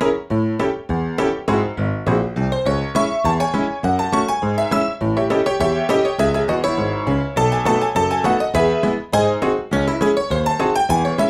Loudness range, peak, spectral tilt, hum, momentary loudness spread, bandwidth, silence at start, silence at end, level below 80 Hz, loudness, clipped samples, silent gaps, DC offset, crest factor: 2 LU; -4 dBFS; -6 dB/octave; none; 3 LU; 15 kHz; 0 s; 0 s; -38 dBFS; -19 LUFS; under 0.1%; none; under 0.1%; 14 dB